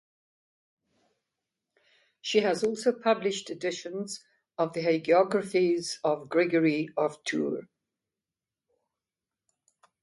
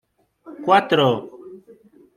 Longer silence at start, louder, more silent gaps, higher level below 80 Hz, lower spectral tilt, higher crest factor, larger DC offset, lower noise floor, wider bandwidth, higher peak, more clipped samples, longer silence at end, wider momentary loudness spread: first, 2.25 s vs 0.45 s; second, -28 LUFS vs -19 LUFS; neither; second, -78 dBFS vs -68 dBFS; second, -4.5 dB/octave vs -6 dB/octave; about the same, 20 dB vs 20 dB; neither; first, under -90 dBFS vs -50 dBFS; second, 11.5 kHz vs 15 kHz; second, -10 dBFS vs -2 dBFS; neither; first, 2.4 s vs 0.6 s; second, 12 LU vs 15 LU